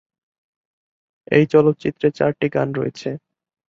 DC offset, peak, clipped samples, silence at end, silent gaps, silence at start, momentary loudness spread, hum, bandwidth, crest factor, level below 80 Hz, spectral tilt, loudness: under 0.1%; -2 dBFS; under 0.1%; 0.5 s; none; 1.3 s; 14 LU; none; 7.4 kHz; 20 dB; -60 dBFS; -8 dB/octave; -19 LUFS